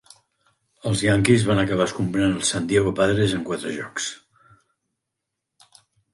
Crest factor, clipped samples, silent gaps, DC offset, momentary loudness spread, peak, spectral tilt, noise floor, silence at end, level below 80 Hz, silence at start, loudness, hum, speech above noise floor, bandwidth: 20 dB; under 0.1%; none; under 0.1%; 11 LU; -4 dBFS; -5 dB/octave; -82 dBFS; 2 s; -48 dBFS; 0.85 s; -22 LUFS; none; 61 dB; 11.5 kHz